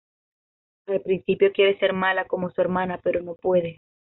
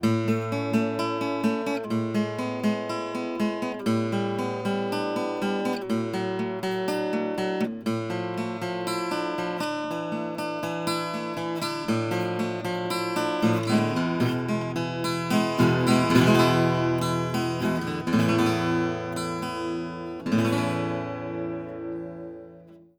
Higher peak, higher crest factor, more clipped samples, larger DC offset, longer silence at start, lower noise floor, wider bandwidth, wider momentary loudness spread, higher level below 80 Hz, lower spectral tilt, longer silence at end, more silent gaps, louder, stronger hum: about the same, -8 dBFS vs -6 dBFS; about the same, 16 dB vs 20 dB; neither; neither; first, 0.9 s vs 0 s; first, under -90 dBFS vs -49 dBFS; second, 4.1 kHz vs over 20 kHz; about the same, 8 LU vs 8 LU; about the same, -60 dBFS vs -60 dBFS; second, -3.5 dB/octave vs -6 dB/octave; first, 0.45 s vs 0.2 s; neither; first, -23 LUFS vs -26 LUFS; neither